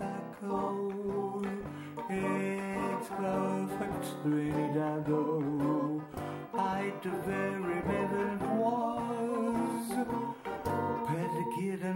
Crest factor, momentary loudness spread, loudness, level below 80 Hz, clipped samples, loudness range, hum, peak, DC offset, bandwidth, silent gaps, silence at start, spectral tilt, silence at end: 16 dB; 6 LU; -34 LUFS; -62 dBFS; under 0.1%; 2 LU; none; -18 dBFS; under 0.1%; 16.5 kHz; none; 0 s; -7 dB/octave; 0 s